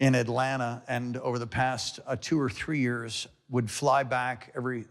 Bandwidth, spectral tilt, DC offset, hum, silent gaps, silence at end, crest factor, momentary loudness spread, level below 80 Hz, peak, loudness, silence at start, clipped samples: 13 kHz; -5 dB/octave; under 0.1%; none; none; 0.05 s; 16 dB; 8 LU; -62 dBFS; -12 dBFS; -30 LUFS; 0 s; under 0.1%